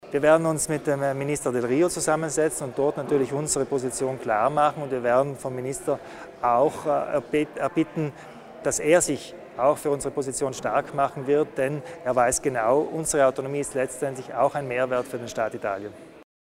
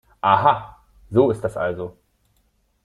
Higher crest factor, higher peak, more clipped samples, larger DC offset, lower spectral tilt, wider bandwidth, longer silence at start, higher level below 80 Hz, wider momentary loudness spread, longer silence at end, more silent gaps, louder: about the same, 20 dB vs 22 dB; second, -6 dBFS vs 0 dBFS; neither; neither; second, -4.5 dB/octave vs -7.5 dB/octave; first, 16 kHz vs 11.5 kHz; second, 0.05 s vs 0.25 s; about the same, -56 dBFS vs -54 dBFS; about the same, 10 LU vs 12 LU; second, 0.2 s vs 0.95 s; neither; second, -25 LUFS vs -20 LUFS